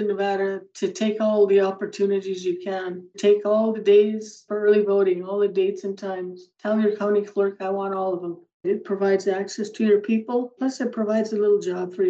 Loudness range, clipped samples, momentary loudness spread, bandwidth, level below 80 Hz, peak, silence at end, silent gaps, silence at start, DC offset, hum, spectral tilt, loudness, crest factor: 4 LU; under 0.1%; 12 LU; 7.8 kHz; -86 dBFS; -8 dBFS; 0 s; 8.54-8.60 s; 0 s; under 0.1%; none; -6 dB/octave; -23 LUFS; 14 dB